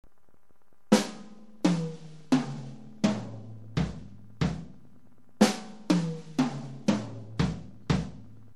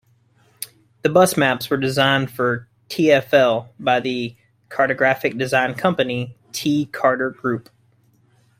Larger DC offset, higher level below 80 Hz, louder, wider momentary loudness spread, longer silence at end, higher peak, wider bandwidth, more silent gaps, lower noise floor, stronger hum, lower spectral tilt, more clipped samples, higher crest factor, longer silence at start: first, 0.4% vs under 0.1%; first, -50 dBFS vs -60 dBFS; second, -30 LUFS vs -19 LUFS; first, 19 LU vs 14 LU; second, 0.2 s vs 1 s; second, -6 dBFS vs -2 dBFS; second, 14 kHz vs 16 kHz; neither; first, -69 dBFS vs -58 dBFS; neither; about the same, -6 dB/octave vs -5 dB/octave; neither; first, 24 dB vs 18 dB; first, 0.9 s vs 0.6 s